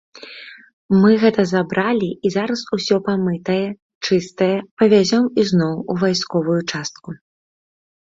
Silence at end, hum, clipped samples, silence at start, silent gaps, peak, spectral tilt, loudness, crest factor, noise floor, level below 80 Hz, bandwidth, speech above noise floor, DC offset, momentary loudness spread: 0.95 s; none; under 0.1%; 0.15 s; 0.73-0.89 s, 3.82-4.01 s, 4.71-4.77 s; -2 dBFS; -6 dB/octave; -18 LUFS; 16 dB; -38 dBFS; -58 dBFS; 7.8 kHz; 21 dB; under 0.1%; 16 LU